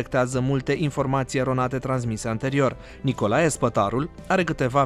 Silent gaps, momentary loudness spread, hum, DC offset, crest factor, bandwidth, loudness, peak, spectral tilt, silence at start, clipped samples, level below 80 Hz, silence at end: none; 5 LU; none; under 0.1%; 16 dB; 13 kHz; -24 LUFS; -8 dBFS; -6 dB/octave; 0 s; under 0.1%; -46 dBFS; 0 s